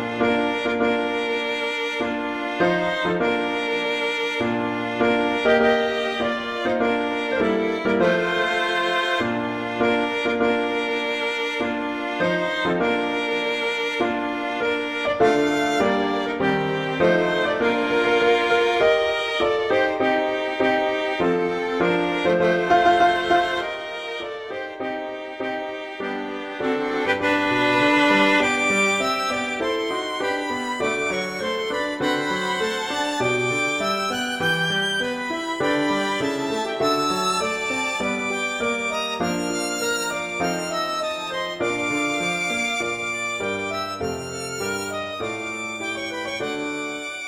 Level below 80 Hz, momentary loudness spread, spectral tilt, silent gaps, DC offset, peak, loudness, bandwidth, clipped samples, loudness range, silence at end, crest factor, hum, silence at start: -56 dBFS; 9 LU; -4 dB/octave; none; under 0.1%; -6 dBFS; -22 LUFS; 16.5 kHz; under 0.1%; 4 LU; 0 s; 16 dB; none; 0 s